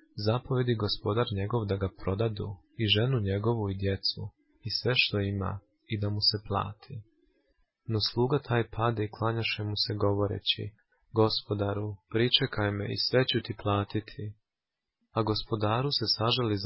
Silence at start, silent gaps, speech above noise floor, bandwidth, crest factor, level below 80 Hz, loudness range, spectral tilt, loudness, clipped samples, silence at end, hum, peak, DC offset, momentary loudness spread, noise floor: 0.15 s; none; 60 dB; 5.8 kHz; 20 dB; -50 dBFS; 2 LU; -9 dB/octave; -29 LUFS; under 0.1%; 0 s; none; -10 dBFS; under 0.1%; 12 LU; -89 dBFS